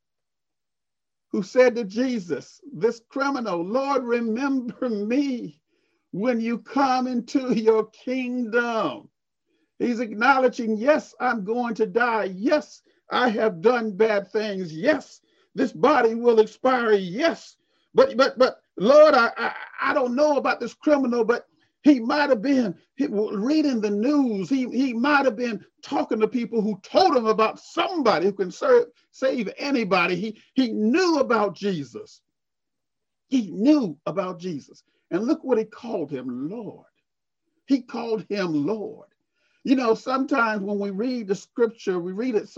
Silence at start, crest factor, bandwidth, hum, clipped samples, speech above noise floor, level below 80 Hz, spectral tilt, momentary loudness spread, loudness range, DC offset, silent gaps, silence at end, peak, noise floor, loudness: 1.35 s; 18 dB; 7.8 kHz; none; under 0.1%; 66 dB; -72 dBFS; -5.5 dB/octave; 10 LU; 7 LU; under 0.1%; none; 0.1 s; -4 dBFS; -89 dBFS; -23 LUFS